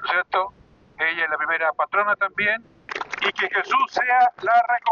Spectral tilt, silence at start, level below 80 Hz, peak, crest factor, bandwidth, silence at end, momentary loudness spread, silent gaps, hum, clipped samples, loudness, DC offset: -2.5 dB/octave; 0 s; -64 dBFS; -10 dBFS; 14 dB; 7.2 kHz; 0 s; 9 LU; none; none; under 0.1%; -21 LUFS; under 0.1%